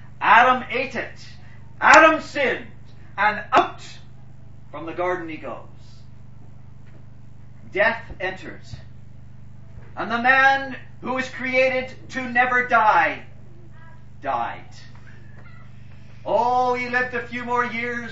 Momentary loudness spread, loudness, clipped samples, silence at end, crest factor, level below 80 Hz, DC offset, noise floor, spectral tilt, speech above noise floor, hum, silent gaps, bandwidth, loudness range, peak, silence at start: 22 LU; -20 LUFS; under 0.1%; 0 s; 22 dB; -52 dBFS; 1%; -45 dBFS; -4 dB/octave; 24 dB; 50 Hz at -55 dBFS; none; 8 kHz; 13 LU; 0 dBFS; 0 s